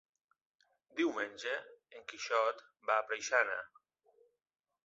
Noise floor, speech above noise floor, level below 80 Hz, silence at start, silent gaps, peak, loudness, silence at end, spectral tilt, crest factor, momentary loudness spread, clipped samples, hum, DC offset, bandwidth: -71 dBFS; 35 dB; -86 dBFS; 0.95 s; none; -16 dBFS; -36 LUFS; 1.2 s; 1 dB/octave; 24 dB; 17 LU; under 0.1%; none; under 0.1%; 8 kHz